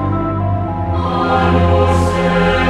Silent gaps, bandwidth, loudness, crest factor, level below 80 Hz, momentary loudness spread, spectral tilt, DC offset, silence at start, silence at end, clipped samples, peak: none; 11 kHz; -15 LUFS; 14 dB; -28 dBFS; 6 LU; -7 dB/octave; under 0.1%; 0 s; 0 s; under 0.1%; 0 dBFS